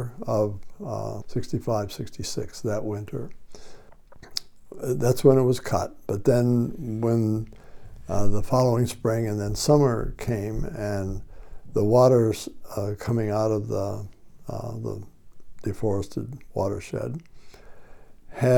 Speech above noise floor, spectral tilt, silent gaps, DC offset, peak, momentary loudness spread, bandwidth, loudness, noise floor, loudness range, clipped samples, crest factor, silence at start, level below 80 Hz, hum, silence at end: 22 dB; -7 dB/octave; none; under 0.1%; -6 dBFS; 15 LU; 18.5 kHz; -26 LUFS; -45 dBFS; 9 LU; under 0.1%; 20 dB; 0 s; -42 dBFS; none; 0 s